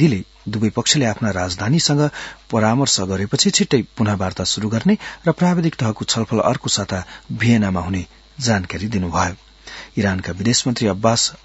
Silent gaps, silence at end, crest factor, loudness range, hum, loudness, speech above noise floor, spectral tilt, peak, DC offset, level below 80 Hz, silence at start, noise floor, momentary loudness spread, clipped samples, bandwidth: none; 0.1 s; 18 dB; 3 LU; none; -19 LUFS; 20 dB; -4.5 dB/octave; 0 dBFS; under 0.1%; -48 dBFS; 0 s; -38 dBFS; 10 LU; under 0.1%; 8.2 kHz